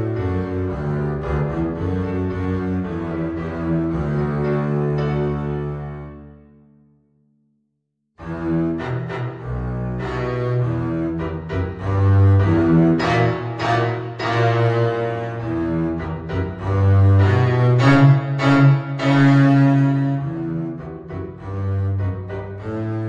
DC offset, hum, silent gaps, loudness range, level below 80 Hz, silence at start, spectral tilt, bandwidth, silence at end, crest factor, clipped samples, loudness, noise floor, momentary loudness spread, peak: under 0.1%; none; none; 12 LU; -40 dBFS; 0 s; -8.5 dB/octave; 7.6 kHz; 0 s; 18 dB; under 0.1%; -19 LUFS; -73 dBFS; 13 LU; 0 dBFS